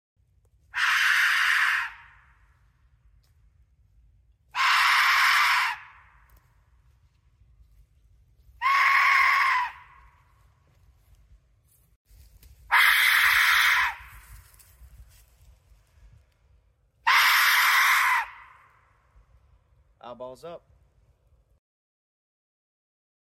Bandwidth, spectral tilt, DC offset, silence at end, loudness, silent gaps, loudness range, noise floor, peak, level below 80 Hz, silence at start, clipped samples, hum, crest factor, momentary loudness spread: 16 kHz; 2 dB/octave; under 0.1%; 2.75 s; -20 LUFS; 11.96-12.05 s; 9 LU; -64 dBFS; -8 dBFS; -60 dBFS; 0.75 s; under 0.1%; none; 20 dB; 19 LU